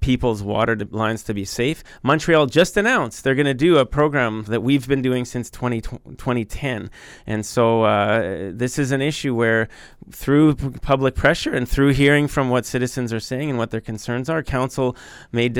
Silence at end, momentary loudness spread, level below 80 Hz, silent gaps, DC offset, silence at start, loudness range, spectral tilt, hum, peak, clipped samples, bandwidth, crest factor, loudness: 0 s; 11 LU; -36 dBFS; none; under 0.1%; 0 s; 4 LU; -5.5 dB/octave; none; -2 dBFS; under 0.1%; 18 kHz; 16 dB; -20 LUFS